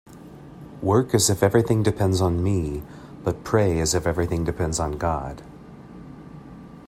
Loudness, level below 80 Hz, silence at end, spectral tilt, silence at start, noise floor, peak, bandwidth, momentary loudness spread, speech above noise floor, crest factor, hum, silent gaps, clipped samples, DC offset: -22 LUFS; -42 dBFS; 0.05 s; -5.5 dB/octave; 0.1 s; -43 dBFS; -4 dBFS; 16 kHz; 23 LU; 21 dB; 20 dB; none; none; under 0.1%; under 0.1%